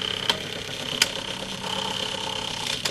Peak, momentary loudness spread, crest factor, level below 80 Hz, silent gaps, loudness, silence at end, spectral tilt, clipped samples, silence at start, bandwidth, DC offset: -2 dBFS; 7 LU; 26 dB; -54 dBFS; none; -26 LUFS; 0 s; -1.5 dB/octave; under 0.1%; 0 s; 15.5 kHz; under 0.1%